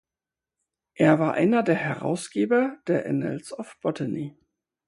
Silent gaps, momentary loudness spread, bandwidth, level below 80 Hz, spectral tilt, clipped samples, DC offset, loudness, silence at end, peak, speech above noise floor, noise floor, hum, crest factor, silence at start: none; 12 LU; 11.5 kHz; -70 dBFS; -7 dB/octave; under 0.1%; under 0.1%; -25 LUFS; 0.6 s; -4 dBFS; 66 dB; -90 dBFS; none; 20 dB; 1 s